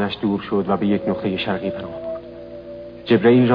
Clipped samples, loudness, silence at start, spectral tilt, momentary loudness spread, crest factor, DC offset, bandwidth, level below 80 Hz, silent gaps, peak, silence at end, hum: under 0.1%; -20 LUFS; 0 s; -9.5 dB/octave; 20 LU; 18 dB; under 0.1%; 5.2 kHz; -52 dBFS; none; -2 dBFS; 0 s; 60 Hz at -45 dBFS